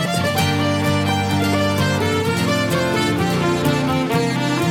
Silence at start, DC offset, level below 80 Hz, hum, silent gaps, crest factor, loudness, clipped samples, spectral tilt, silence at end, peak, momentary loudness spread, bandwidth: 0 s; under 0.1%; -46 dBFS; none; none; 14 dB; -18 LUFS; under 0.1%; -5 dB/octave; 0 s; -4 dBFS; 1 LU; 17.5 kHz